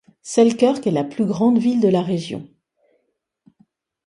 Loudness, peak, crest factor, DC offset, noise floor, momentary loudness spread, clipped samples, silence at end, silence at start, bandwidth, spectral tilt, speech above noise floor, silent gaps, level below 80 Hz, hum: -18 LUFS; -2 dBFS; 18 dB; under 0.1%; -72 dBFS; 9 LU; under 0.1%; 1.6 s; 0.25 s; 11 kHz; -6.5 dB/octave; 54 dB; none; -64 dBFS; none